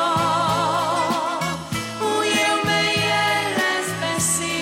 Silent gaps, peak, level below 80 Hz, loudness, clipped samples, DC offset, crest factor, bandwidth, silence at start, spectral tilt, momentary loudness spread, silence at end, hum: none; -10 dBFS; -52 dBFS; -20 LUFS; under 0.1%; under 0.1%; 12 dB; 16.5 kHz; 0 s; -2.5 dB/octave; 6 LU; 0 s; none